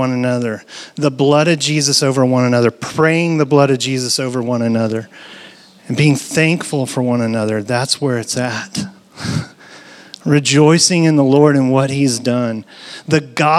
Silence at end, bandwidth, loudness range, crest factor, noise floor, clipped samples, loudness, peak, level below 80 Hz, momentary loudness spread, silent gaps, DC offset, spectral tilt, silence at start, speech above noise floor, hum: 0 s; 14.5 kHz; 5 LU; 14 dB; -40 dBFS; under 0.1%; -15 LUFS; 0 dBFS; -60 dBFS; 14 LU; none; under 0.1%; -5 dB/octave; 0 s; 26 dB; none